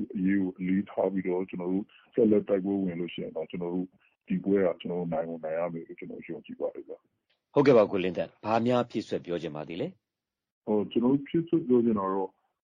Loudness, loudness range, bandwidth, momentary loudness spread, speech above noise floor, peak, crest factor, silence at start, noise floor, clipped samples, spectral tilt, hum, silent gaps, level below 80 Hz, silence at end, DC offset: -29 LUFS; 4 LU; 7.4 kHz; 14 LU; 60 dB; -8 dBFS; 20 dB; 0 s; -89 dBFS; under 0.1%; -8.5 dB/octave; none; 10.52-10.62 s; -68 dBFS; 0.35 s; under 0.1%